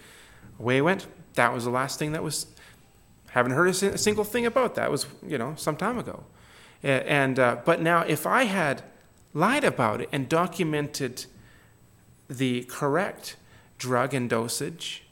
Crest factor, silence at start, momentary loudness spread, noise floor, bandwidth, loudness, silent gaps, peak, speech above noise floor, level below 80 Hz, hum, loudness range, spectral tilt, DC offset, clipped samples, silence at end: 22 dB; 0.05 s; 11 LU; -56 dBFS; 17.5 kHz; -26 LUFS; none; -4 dBFS; 31 dB; -60 dBFS; none; 5 LU; -4.5 dB/octave; under 0.1%; under 0.1%; 0.1 s